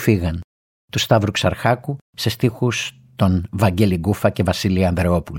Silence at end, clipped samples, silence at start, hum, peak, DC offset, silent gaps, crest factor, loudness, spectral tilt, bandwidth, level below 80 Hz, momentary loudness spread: 0 s; under 0.1%; 0 s; none; -2 dBFS; under 0.1%; 0.44-0.88 s, 2.01-2.13 s; 18 dB; -19 LUFS; -6 dB/octave; 17 kHz; -38 dBFS; 8 LU